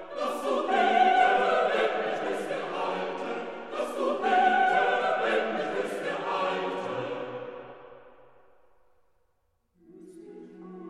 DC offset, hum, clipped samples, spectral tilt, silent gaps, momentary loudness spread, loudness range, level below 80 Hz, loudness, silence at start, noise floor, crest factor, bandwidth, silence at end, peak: 0.2%; none; under 0.1%; -4 dB/octave; none; 17 LU; 13 LU; -72 dBFS; -27 LUFS; 0 s; -73 dBFS; 18 dB; 13 kHz; 0 s; -10 dBFS